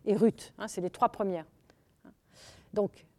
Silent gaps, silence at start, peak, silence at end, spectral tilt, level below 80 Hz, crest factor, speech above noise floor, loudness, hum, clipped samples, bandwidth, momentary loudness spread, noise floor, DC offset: none; 0.05 s; -12 dBFS; 0.3 s; -6.5 dB/octave; -68 dBFS; 22 dB; 34 dB; -32 LUFS; none; under 0.1%; 14 kHz; 12 LU; -65 dBFS; under 0.1%